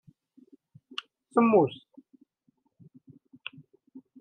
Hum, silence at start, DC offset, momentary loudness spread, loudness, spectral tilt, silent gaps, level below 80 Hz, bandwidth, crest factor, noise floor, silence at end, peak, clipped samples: none; 1.35 s; under 0.1%; 22 LU; -26 LUFS; -7.5 dB/octave; none; -80 dBFS; 9.2 kHz; 22 dB; -72 dBFS; 0.2 s; -8 dBFS; under 0.1%